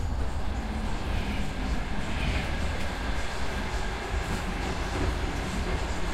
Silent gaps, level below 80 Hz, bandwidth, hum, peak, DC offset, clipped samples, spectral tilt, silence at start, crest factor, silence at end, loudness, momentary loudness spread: none; -32 dBFS; 14.5 kHz; none; -16 dBFS; under 0.1%; under 0.1%; -5 dB/octave; 0 s; 14 dB; 0 s; -32 LUFS; 3 LU